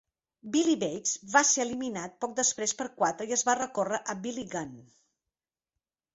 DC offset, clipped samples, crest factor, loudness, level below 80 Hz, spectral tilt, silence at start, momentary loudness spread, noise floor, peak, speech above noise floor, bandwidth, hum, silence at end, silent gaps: under 0.1%; under 0.1%; 24 dB; -29 LUFS; -72 dBFS; -2 dB/octave; 0.45 s; 12 LU; under -90 dBFS; -8 dBFS; over 60 dB; 8.2 kHz; none; 1.3 s; none